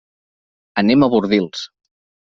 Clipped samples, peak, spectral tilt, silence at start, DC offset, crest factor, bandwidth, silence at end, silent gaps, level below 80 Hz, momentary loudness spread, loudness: under 0.1%; -2 dBFS; -4.5 dB/octave; 0.75 s; under 0.1%; 16 dB; 7.4 kHz; 0.65 s; none; -54 dBFS; 15 LU; -16 LUFS